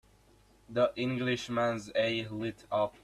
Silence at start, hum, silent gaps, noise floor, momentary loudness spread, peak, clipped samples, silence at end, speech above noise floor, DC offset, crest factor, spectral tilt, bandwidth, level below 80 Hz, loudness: 0.7 s; 50 Hz at -65 dBFS; none; -63 dBFS; 7 LU; -16 dBFS; under 0.1%; 0.15 s; 31 dB; under 0.1%; 18 dB; -5.5 dB/octave; 13 kHz; -64 dBFS; -32 LUFS